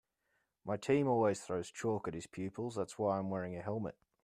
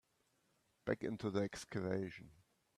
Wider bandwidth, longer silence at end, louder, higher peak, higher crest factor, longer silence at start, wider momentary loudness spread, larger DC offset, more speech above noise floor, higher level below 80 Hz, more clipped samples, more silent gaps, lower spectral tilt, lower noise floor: about the same, 14 kHz vs 13.5 kHz; about the same, 0.35 s vs 0.45 s; first, -37 LUFS vs -42 LUFS; about the same, -20 dBFS vs -22 dBFS; about the same, 18 dB vs 22 dB; second, 0.65 s vs 0.85 s; about the same, 11 LU vs 9 LU; neither; first, 45 dB vs 38 dB; about the same, -72 dBFS vs -74 dBFS; neither; neither; about the same, -6.5 dB/octave vs -6 dB/octave; about the same, -82 dBFS vs -80 dBFS